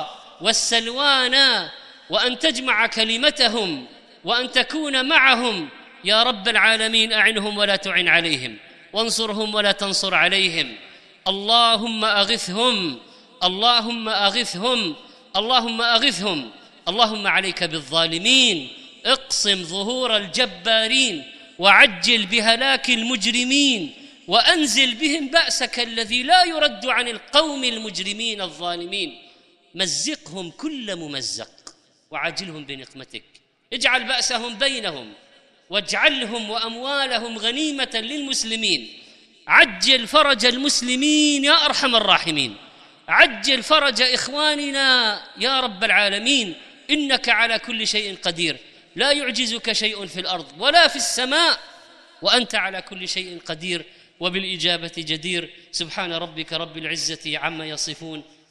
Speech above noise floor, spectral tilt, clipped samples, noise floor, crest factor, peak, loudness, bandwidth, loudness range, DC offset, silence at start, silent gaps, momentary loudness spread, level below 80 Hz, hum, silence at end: 33 dB; -1.5 dB/octave; under 0.1%; -53 dBFS; 20 dB; 0 dBFS; -18 LUFS; 13.5 kHz; 8 LU; under 0.1%; 0 s; none; 13 LU; -58 dBFS; none; 0.3 s